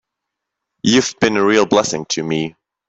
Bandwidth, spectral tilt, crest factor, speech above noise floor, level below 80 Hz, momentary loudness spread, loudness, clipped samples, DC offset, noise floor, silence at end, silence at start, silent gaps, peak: 8.2 kHz; -4 dB/octave; 18 dB; 64 dB; -56 dBFS; 8 LU; -16 LUFS; under 0.1%; under 0.1%; -80 dBFS; 0.4 s; 0.85 s; none; 0 dBFS